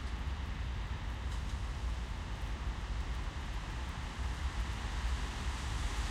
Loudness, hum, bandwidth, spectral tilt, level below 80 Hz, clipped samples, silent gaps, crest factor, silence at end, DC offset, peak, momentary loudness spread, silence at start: -40 LUFS; none; 12.5 kHz; -4.5 dB/octave; -40 dBFS; under 0.1%; none; 14 dB; 0 s; under 0.1%; -24 dBFS; 3 LU; 0 s